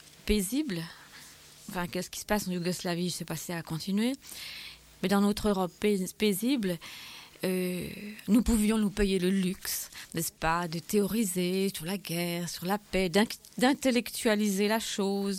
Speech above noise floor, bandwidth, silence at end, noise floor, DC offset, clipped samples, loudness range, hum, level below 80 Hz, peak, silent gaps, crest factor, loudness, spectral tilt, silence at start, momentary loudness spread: 22 dB; 16.5 kHz; 0 s; -52 dBFS; under 0.1%; under 0.1%; 4 LU; none; -48 dBFS; -12 dBFS; none; 18 dB; -30 LUFS; -4.5 dB/octave; 0.05 s; 13 LU